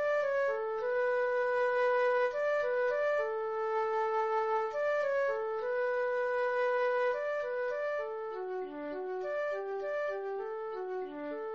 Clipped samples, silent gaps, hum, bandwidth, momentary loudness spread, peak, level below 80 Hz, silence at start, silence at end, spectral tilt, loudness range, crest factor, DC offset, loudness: under 0.1%; none; none; 7 kHz; 8 LU; -22 dBFS; -72 dBFS; 0 s; 0 s; -0.5 dB/octave; 6 LU; 12 dB; under 0.1%; -33 LUFS